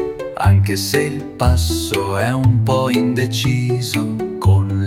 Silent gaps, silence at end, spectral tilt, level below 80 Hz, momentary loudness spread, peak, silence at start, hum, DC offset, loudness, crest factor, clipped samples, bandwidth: none; 0 s; -6 dB/octave; -32 dBFS; 5 LU; -2 dBFS; 0 s; none; under 0.1%; -17 LUFS; 14 dB; under 0.1%; 16.5 kHz